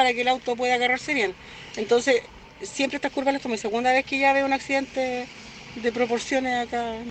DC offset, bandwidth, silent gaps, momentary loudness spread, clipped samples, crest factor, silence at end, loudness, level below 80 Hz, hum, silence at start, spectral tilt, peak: under 0.1%; 9 kHz; none; 13 LU; under 0.1%; 18 dB; 0 s; -24 LUFS; -56 dBFS; none; 0 s; -3 dB/octave; -6 dBFS